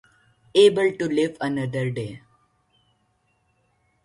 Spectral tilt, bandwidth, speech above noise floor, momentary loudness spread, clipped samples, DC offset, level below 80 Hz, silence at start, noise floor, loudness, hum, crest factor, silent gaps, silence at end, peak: -6 dB/octave; 11.5 kHz; 47 dB; 12 LU; under 0.1%; under 0.1%; -64 dBFS; 0.55 s; -68 dBFS; -22 LUFS; none; 20 dB; none; 1.9 s; -6 dBFS